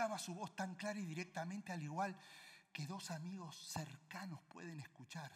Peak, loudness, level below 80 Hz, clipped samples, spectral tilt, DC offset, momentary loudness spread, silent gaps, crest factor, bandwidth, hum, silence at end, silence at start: -28 dBFS; -48 LUFS; -88 dBFS; under 0.1%; -4.5 dB/octave; under 0.1%; 9 LU; none; 20 dB; 16 kHz; none; 0 s; 0 s